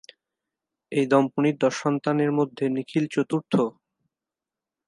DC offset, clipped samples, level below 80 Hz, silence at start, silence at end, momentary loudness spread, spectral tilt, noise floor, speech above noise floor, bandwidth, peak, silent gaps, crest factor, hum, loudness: under 0.1%; under 0.1%; -74 dBFS; 0.9 s; 1.15 s; 6 LU; -6.5 dB/octave; -89 dBFS; 66 dB; 11 kHz; -6 dBFS; none; 20 dB; none; -24 LUFS